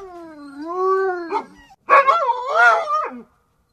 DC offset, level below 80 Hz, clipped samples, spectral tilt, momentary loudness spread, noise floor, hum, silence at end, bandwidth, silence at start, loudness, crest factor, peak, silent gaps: under 0.1%; -64 dBFS; under 0.1%; -3 dB/octave; 21 LU; -57 dBFS; none; 0.5 s; 11.5 kHz; 0 s; -17 LUFS; 18 dB; -2 dBFS; none